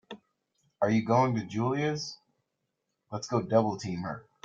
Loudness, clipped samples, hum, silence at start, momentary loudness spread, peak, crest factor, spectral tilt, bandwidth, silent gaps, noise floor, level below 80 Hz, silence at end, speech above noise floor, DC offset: -29 LUFS; under 0.1%; none; 0.1 s; 15 LU; -10 dBFS; 20 dB; -6.5 dB/octave; 7.6 kHz; none; -82 dBFS; -68 dBFS; 0.25 s; 54 dB; under 0.1%